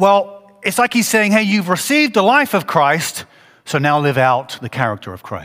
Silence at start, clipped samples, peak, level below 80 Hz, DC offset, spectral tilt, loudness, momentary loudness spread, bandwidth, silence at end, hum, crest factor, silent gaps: 0 s; under 0.1%; 0 dBFS; -60 dBFS; under 0.1%; -4.5 dB/octave; -15 LUFS; 11 LU; 16 kHz; 0 s; none; 16 dB; none